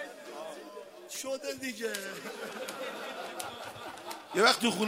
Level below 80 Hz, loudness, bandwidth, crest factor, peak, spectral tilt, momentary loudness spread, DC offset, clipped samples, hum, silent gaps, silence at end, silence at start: -80 dBFS; -34 LUFS; 16 kHz; 26 dB; -8 dBFS; -2.5 dB/octave; 18 LU; under 0.1%; under 0.1%; none; none; 0 s; 0 s